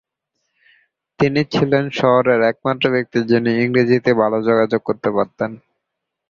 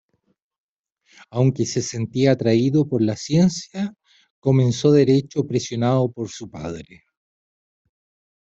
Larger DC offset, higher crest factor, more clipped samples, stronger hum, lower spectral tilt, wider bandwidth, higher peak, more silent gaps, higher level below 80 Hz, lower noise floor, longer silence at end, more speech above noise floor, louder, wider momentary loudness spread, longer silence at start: neither; about the same, 16 dB vs 18 dB; neither; neither; about the same, -7.5 dB/octave vs -6.5 dB/octave; second, 7.2 kHz vs 8 kHz; about the same, -2 dBFS vs -4 dBFS; second, none vs 4.30-4.42 s; about the same, -56 dBFS vs -56 dBFS; first, -79 dBFS vs -69 dBFS; second, 0.7 s vs 1.75 s; first, 63 dB vs 50 dB; first, -17 LUFS vs -20 LUFS; second, 5 LU vs 15 LU; second, 1.2 s vs 1.35 s